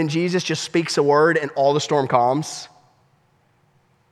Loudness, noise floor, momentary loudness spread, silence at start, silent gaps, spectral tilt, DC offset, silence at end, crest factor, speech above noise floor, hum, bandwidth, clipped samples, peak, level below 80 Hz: -19 LUFS; -61 dBFS; 8 LU; 0 s; none; -5 dB/octave; under 0.1%; 1.45 s; 18 dB; 42 dB; none; 13 kHz; under 0.1%; -2 dBFS; -70 dBFS